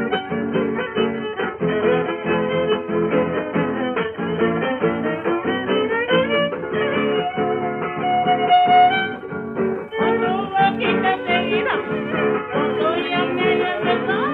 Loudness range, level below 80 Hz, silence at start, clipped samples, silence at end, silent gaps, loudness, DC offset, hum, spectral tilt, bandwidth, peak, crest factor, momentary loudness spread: 3 LU; -56 dBFS; 0 s; under 0.1%; 0 s; none; -20 LUFS; under 0.1%; none; -8.5 dB/octave; 4.6 kHz; -4 dBFS; 16 dB; 6 LU